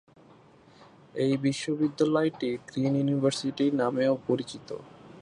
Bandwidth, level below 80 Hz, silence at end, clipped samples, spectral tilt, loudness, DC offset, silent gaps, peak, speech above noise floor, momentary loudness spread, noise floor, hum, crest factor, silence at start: 11 kHz; -70 dBFS; 0 s; under 0.1%; -6 dB/octave; -28 LUFS; under 0.1%; none; -12 dBFS; 28 dB; 13 LU; -56 dBFS; none; 16 dB; 0.8 s